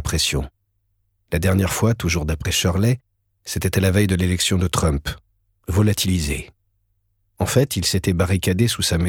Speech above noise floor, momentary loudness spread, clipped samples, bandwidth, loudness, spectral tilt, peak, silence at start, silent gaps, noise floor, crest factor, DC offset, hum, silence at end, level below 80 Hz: 49 dB; 9 LU; under 0.1%; 18 kHz; -20 LUFS; -4.5 dB/octave; -4 dBFS; 0 s; none; -68 dBFS; 18 dB; under 0.1%; none; 0 s; -34 dBFS